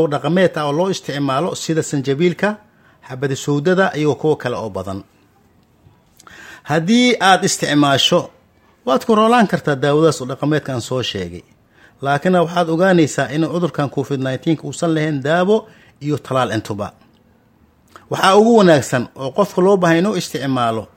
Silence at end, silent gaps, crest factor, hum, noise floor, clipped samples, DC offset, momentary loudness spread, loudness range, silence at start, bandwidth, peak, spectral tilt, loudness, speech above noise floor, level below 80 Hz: 0.1 s; none; 16 dB; none; -54 dBFS; under 0.1%; under 0.1%; 13 LU; 6 LU; 0 s; 16.5 kHz; 0 dBFS; -5 dB/octave; -16 LUFS; 38 dB; -58 dBFS